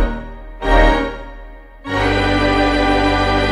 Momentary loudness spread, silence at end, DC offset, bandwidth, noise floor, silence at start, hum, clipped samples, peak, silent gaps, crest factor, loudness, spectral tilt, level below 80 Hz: 19 LU; 0 s; under 0.1%; 10 kHz; -35 dBFS; 0 s; none; under 0.1%; 0 dBFS; none; 16 dB; -16 LUFS; -6 dB/octave; -22 dBFS